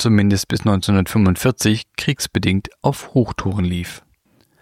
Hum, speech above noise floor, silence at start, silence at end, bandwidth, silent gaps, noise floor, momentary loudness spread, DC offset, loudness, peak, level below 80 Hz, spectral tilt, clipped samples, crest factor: none; 41 dB; 0 s; 0.65 s; 16 kHz; none; -58 dBFS; 7 LU; under 0.1%; -18 LUFS; -2 dBFS; -42 dBFS; -5.5 dB/octave; under 0.1%; 16 dB